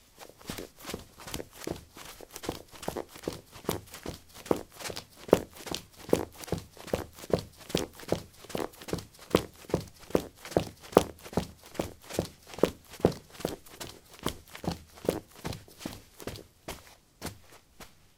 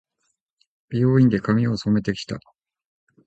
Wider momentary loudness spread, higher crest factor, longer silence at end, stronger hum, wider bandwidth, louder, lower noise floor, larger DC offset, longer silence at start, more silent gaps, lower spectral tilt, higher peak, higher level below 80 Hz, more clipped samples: about the same, 13 LU vs 14 LU; first, 34 dB vs 16 dB; second, 0.3 s vs 0.85 s; neither; first, 18 kHz vs 8.2 kHz; second, -35 LUFS vs -21 LUFS; second, -54 dBFS vs -74 dBFS; neither; second, 0.2 s vs 0.9 s; neither; second, -5 dB/octave vs -8 dB/octave; first, -2 dBFS vs -6 dBFS; about the same, -54 dBFS vs -52 dBFS; neither